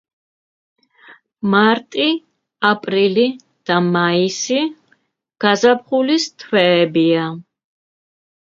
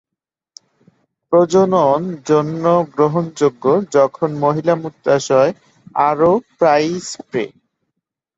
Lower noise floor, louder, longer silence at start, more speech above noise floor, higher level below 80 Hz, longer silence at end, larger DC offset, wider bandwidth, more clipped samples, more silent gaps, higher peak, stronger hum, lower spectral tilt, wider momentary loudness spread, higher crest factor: second, -61 dBFS vs -83 dBFS; about the same, -16 LUFS vs -16 LUFS; second, 1.1 s vs 1.3 s; second, 46 dB vs 68 dB; second, -66 dBFS vs -60 dBFS; first, 1.05 s vs 0.9 s; neither; about the same, 7.8 kHz vs 8 kHz; neither; neither; about the same, 0 dBFS vs -2 dBFS; neither; second, -4.5 dB/octave vs -6 dB/octave; about the same, 8 LU vs 9 LU; about the same, 18 dB vs 16 dB